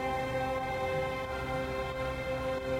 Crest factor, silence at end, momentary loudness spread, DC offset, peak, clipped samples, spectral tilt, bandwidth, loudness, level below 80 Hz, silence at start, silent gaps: 12 dB; 0 s; 2 LU; under 0.1%; -22 dBFS; under 0.1%; -5.5 dB/octave; 16 kHz; -34 LUFS; -48 dBFS; 0 s; none